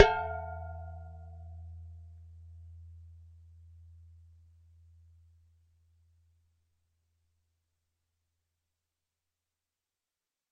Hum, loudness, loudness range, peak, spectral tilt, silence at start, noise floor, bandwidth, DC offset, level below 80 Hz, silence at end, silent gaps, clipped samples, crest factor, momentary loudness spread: none; -36 LUFS; 20 LU; -2 dBFS; -5 dB/octave; 0 s; under -90 dBFS; 7.2 kHz; under 0.1%; -54 dBFS; 7.45 s; none; under 0.1%; 36 dB; 19 LU